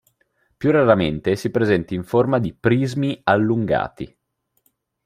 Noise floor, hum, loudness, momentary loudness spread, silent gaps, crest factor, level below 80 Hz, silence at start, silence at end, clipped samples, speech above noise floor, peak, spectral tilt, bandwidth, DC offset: -71 dBFS; none; -19 LUFS; 7 LU; none; 18 dB; -50 dBFS; 0.6 s; 1 s; under 0.1%; 52 dB; -2 dBFS; -7.5 dB/octave; 15 kHz; under 0.1%